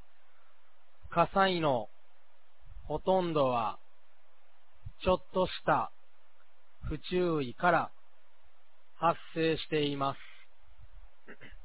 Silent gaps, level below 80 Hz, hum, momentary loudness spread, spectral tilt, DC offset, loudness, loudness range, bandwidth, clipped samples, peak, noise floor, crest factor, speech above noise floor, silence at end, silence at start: none; -54 dBFS; none; 20 LU; -4 dB/octave; 0.8%; -31 LUFS; 3 LU; 4 kHz; under 0.1%; -12 dBFS; -70 dBFS; 22 dB; 39 dB; 0.05 s; 1.05 s